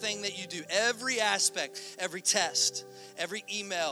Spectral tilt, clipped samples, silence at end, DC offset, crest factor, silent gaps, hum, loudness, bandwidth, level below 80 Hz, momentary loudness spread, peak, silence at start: 0 dB/octave; under 0.1%; 0 s; under 0.1%; 22 dB; none; none; -29 LUFS; over 20 kHz; -82 dBFS; 11 LU; -10 dBFS; 0 s